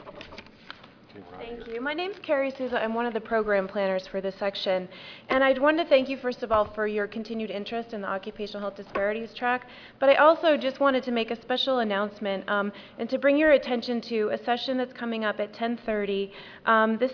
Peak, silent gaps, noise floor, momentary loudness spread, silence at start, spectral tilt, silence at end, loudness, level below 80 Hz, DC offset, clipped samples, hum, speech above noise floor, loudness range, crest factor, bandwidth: -6 dBFS; none; -48 dBFS; 15 LU; 0 s; -6 dB/octave; 0 s; -26 LUFS; -60 dBFS; under 0.1%; under 0.1%; none; 22 dB; 6 LU; 20 dB; 5.4 kHz